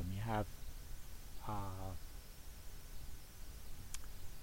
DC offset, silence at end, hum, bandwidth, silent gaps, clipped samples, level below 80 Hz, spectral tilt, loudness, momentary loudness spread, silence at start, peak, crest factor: under 0.1%; 0 s; none; 16 kHz; none; under 0.1%; -50 dBFS; -5 dB/octave; -49 LUFS; 14 LU; 0 s; -24 dBFS; 20 dB